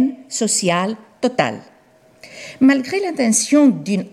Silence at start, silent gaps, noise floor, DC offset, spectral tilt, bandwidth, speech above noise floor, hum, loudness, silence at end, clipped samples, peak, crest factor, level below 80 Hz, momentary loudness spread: 0 s; none; -51 dBFS; under 0.1%; -4 dB/octave; 14 kHz; 34 dB; none; -17 LUFS; 0.05 s; under 0.1%; -4 dBFS; 14 dB; -66 dBFS; 11 LU